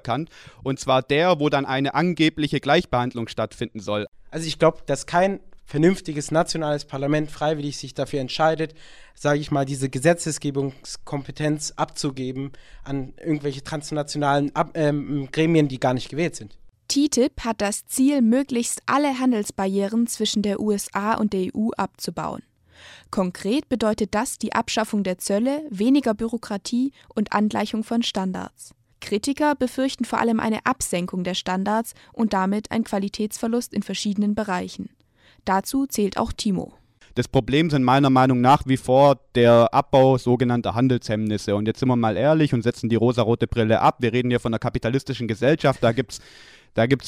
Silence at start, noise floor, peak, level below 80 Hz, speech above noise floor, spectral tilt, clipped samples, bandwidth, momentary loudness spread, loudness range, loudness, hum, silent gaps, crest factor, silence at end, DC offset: 0.05 s; -57 dBFS; -4 dBFS; -48 dBFS; 35 dB; -5.5 dB/octave; under 0.1%; 15.5 kHz; 11 LU; 7 LU; -22 LUFS; none; 4.08-4.12 s; 18 dB; 0 s; under 0.1%